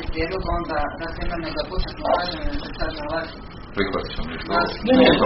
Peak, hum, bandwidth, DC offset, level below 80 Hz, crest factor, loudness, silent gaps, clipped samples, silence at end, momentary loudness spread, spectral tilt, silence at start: -2 dBFS; none; 5.8 kHz; under 0.1%; -32 dBFS; 20 dB; -24 LUFS; none; under 0.1%; 0 s; 10 LU; -3.5 dB/octave; 0 s